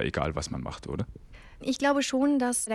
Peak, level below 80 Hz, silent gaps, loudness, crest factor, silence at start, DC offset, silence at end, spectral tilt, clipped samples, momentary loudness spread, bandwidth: -12 dBFS; -46 dBFS; none; -29 LUFS; 18 dB; 0 s; under 0.1%; 0 s; -4.5 dB/octave; under 0.1%; 11 LU; 15 kHz